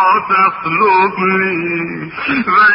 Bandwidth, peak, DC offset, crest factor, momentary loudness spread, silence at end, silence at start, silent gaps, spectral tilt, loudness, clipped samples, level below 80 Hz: 5.6 kHz; 0 dBFS; under 0.1%; 12 dB; 8 LU; 0 s; 0 s; none; -10.5 dB/octave; -13 LUFS; under 0.1%; -54 dBFS